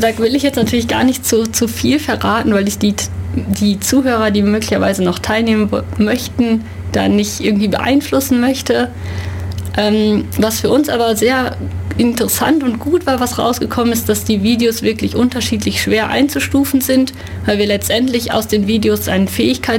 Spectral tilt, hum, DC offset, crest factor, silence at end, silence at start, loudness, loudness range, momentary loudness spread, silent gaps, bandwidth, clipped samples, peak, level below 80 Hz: -4.5 dB/octave; none; under 0.1%; 12 dB; 0 s; 0 s; -15 LUFS; 1 LU; 4 LU; none; 17 kHz; under 0.1%; -2 dBFS; -36 dBFS